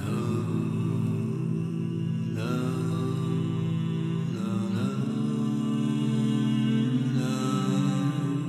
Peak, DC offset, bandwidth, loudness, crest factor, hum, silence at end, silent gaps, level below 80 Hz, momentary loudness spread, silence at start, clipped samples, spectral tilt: -14 dBFS; under 0.1%; 13.5 kHz; -28 LUFS; 12 dB; none; 0 s; none; -70 dBFS; 4 LU; 0 s; under 0.1%; -7.5 dB/octave